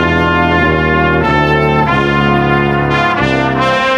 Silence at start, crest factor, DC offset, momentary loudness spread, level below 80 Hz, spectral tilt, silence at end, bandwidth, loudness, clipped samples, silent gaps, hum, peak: 0 s; 10 dB; under 0.1%; 1 LU; -28 dBFS; -7 dB/octave; 0 s; 12 kHz; -11 LUFS; under 0.1%; none; none; 0 dBFS